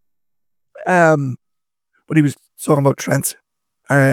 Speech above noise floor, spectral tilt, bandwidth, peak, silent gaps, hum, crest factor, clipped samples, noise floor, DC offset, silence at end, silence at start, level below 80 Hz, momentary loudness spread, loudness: 70 dB; -6 dB/octave; 17 kHz; 0 dBFS; none; none; 18 dB; under 0.1%; -85 dBFS; under 0.1%; 0 s; 0.75 s; -64 dBFS; 14 LU; -17 LUFS